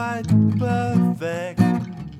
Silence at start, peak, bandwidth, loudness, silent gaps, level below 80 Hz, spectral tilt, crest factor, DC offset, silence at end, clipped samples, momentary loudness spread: 0 s; -4 dBFS; 13 kHz; -21 LUFS; none; -48 dBFS; -8 dB/octave; 16 dB; under 0.1%; 0 s; under 0.1%; 8 LU